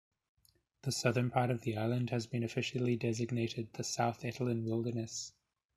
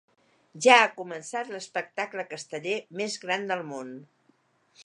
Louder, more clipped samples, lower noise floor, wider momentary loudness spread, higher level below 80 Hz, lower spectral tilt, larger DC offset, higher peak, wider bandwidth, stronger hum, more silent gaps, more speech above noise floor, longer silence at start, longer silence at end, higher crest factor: second, -36 LUFS vs -26 LUFS; neither; about the same, -65 dBFS vs -67 dBFS; second, 7 LU vs 19 LU; first, -70 dBFS vs -86 dBFS; first, -5.5 dB/octave vs -2.5 dB/octave; neither; second, -14 dBFS vs -2 dBFS; first, 13.5 kHz vs 11 kHz; neither; neither; second, 30 dB vs 40 dB; first, 0.85 s vs 0.55 s; first, 0.45 s vs 0.05 s; about the same, 22 dB vs 26 dB